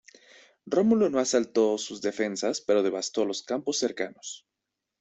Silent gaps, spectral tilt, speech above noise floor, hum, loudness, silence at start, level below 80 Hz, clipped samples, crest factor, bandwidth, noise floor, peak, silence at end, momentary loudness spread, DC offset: none; -3.5 dB/octave; 59 dB; none; -27 LUFS; 0.65 s; -70 dBFS; under 0.1%; 18 dB; 8.4 kHz; -85 dBFS; -10 dBFS; 0.65 s; 11 LU; under 0.1%